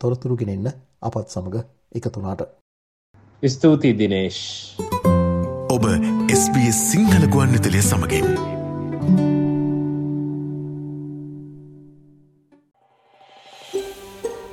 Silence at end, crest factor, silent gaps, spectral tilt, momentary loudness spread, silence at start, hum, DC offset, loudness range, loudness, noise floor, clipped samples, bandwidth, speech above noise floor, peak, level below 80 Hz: 0 s; 18 dB; 2.61-3.14 s; -5.5 dB/octave; 16 LU; 0 s; none; under 0.1%; 17 LU; -20 LUFS; -56 dBFS; under 0.1%; 15.5 kHz; 37 dB; -2 dBFS; -48 dBFS